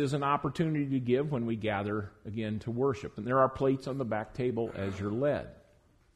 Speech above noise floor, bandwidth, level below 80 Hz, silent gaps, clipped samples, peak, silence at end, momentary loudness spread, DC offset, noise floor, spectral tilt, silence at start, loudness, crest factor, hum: 33 dB; 11.5 kHz; -60 dBFS; none; under 0.1%; -12 dBFS; 0.6 s; 9 LU; under 0.1%; -64 dBFS; -7.5 dB/octave; 0 s; -32 LUFS; 20 dB; none